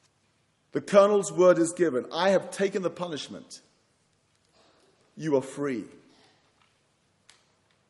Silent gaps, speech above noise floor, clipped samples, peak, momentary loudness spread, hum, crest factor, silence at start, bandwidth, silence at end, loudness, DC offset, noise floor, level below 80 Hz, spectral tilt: none; 44 dB; under 0.1%; -6 dBFS; 18 LU; none; 22 dB; 0.75 s; 11.5 kHz; 2.05 s; -25 LUFS; under 0.1%; -69 dBFS; -78 dBFS; -5 dB/octave